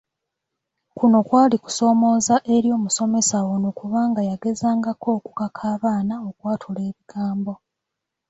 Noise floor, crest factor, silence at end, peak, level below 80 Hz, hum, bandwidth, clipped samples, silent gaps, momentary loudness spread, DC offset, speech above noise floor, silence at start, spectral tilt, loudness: -82 dBFS; 16 dB; 0.75 s; -4 dBFS; -62 dBFS; none; 8.2 kHz; under 0.1%; none; 12 LU; under 0.1%; 62 dB; 0.95 s; -5 dB/octave; -21 LUFS